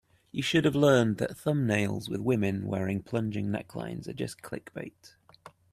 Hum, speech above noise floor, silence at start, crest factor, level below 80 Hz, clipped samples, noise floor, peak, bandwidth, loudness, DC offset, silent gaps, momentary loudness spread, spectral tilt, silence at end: none; 26 dB; 0.35 s; 20 dB; -62 dBFS; under 0.1%; -55 dBFS; -10 dBFS; 14.5 kHz; -29 LUFS; under 0.1%; none; 16 LU; -6 dB/octave; 0.25 s